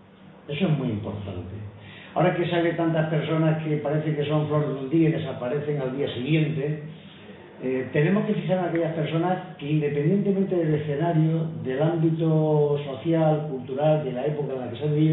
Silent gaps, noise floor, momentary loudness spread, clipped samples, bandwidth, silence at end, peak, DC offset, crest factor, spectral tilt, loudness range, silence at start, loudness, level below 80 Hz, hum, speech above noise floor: none; -44 dBFS; 11 LU; under 0.1%; 4 kHz; 0 s; -8 dBFS; under 0.1%; 16 dB; -12 dB/octave; 3 LU; 0.2 s; -25 LUFS; -64 dBFS; none; 21 dB